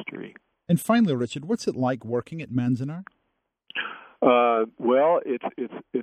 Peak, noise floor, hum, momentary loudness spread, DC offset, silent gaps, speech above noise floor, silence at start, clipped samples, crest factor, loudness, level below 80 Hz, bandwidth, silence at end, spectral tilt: -6 dBFS; -76 dBFS; none; 15 LU; under 0.1%; none; 52 dB; 0 s; under 0.1%; 18 dB; -24 LUFS; -70 dBFS; 13 kHz; 0 s; -6.5 dB/octave